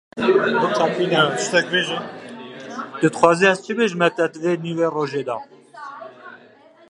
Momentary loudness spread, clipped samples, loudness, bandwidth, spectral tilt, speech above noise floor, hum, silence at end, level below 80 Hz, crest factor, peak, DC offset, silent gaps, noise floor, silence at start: 19 LU; under 0.1%; -19 LUFS; 11.5 kHz; -4.5 dB/octave; 30 dB; none; 0.55 s; -68 dBFS; 20 dB; 0 dBFS; under 0.1%; none; -49 dBFS; 0.15 s